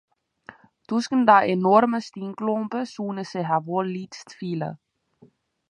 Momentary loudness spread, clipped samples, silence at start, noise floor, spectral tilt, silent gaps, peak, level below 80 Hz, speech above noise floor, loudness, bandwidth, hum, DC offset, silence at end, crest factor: 17 LU; under 0.1%; 0.9 s; -57 dBFS; -6.5 dB/octave; none; -2 dBFS; -74 dBFS; 35 dB; -23 LUFS; 10.5 kHz; none; under 0.1%; 0.95 s; 22 dB